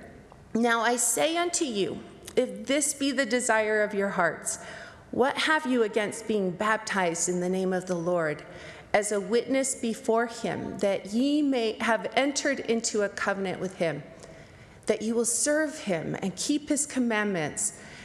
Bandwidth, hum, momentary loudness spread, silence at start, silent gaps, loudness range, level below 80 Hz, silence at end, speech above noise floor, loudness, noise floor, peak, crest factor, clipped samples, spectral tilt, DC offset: 14.5 kHz; none; 8 LU; 0 s; none; 3 LU; -64 dBFS; 0 s; 22 dB; -27 LUFS; -50 dBFS; -10 dBFS; 18 dB; under 0.1%; -3 dB/octave; under 0.1%